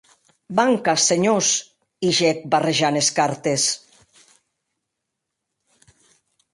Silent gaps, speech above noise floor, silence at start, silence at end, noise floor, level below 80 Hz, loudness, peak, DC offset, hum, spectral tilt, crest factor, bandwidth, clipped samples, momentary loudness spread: none; 61 dB; 0.5 s; 2.75 s; -80 dBFS; -66 dBFS; -19 LUFS; -4 dBFS; under 0.1%; none; -3 dB/octave; 18 dB; 11.5 kHz; under 0.1%; 6 LU